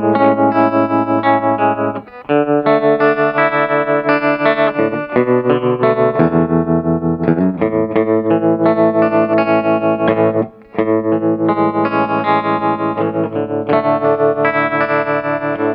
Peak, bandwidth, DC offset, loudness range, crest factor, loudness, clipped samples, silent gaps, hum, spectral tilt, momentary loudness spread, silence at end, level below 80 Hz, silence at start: 0 dBFS; 5.4 kHz; under 0.1%; 2 LU; 14 dB; -14 LUFS; under 0.1%; none; none; -10.5 dB/octave; 5 LU; 0 s; -48 dBFS; 0 s